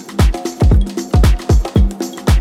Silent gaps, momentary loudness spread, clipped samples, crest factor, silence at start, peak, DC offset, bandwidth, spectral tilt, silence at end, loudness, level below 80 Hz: none; 3 LU; under 0.1%; 12 dB; 0 s; 0 dBFS; under 0.1%; 15 kHz; -6.5 dB/octave; 0 s; -15 LUFS; -14 dBFS